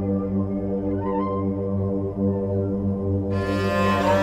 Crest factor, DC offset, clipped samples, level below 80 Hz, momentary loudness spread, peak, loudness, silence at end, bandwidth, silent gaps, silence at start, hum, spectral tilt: 14 dB; 0.2%; under 0.1%; -44 dBFS; 4 LU; -8 dBFS; -24 LUFS; 0 s; 14 kHz; none; 0 s; 50 Hz at -35 dBFS; -8 dB/octave